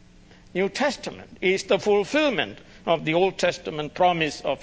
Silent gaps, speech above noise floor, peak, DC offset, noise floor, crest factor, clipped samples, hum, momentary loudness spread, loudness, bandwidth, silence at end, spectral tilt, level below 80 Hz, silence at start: none; 27 dB; -6 dBFS; under 0.1%; -50 dBFS; 18 dB; under 0.1%; none; 10 LU; -24 LUFS; 8 kHz; 0 s; -4.5 dB/octave; -56 dBFS; 0.55 s